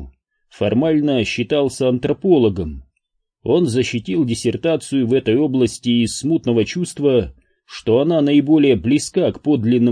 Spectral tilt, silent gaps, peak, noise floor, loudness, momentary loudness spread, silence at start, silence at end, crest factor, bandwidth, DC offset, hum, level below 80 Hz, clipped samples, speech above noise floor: -6 dB/octave; none; -4 dBFS; -72 dBFS; -17 LUFS; 6 LU; 0 s; 0 s; 14 dB; 10.5 kHz; under 0.1%; none; -44 dBFS; under 0.1%; 56 dB